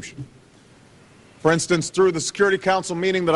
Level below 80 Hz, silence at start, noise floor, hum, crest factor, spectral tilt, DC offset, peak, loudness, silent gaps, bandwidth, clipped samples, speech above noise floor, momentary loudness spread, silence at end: -58 dBFS; 0 s; -51 dBFS; none; 16 dB; -4.5 dB/octave; under 0.1%; -6 dBFS; -20 LUFS; none; 11.5 kHz; under 0.1%; 30 dB; 17 LU; 0 s